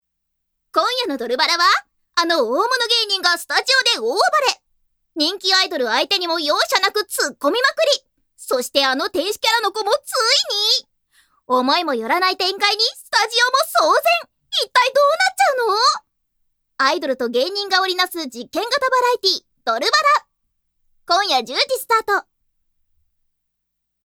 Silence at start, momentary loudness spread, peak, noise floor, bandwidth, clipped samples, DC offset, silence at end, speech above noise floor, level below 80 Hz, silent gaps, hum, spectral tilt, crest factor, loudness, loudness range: 0.75 s; 7 LU; 0 dBFS; -74 dBFS; 19 kHz; under 0.1%; under 0.1%; 1.85 s; 56 dB; -68 dBFS; none; none; 0.5 dB/octave; 20 dB; -17 LUFS; 3 LU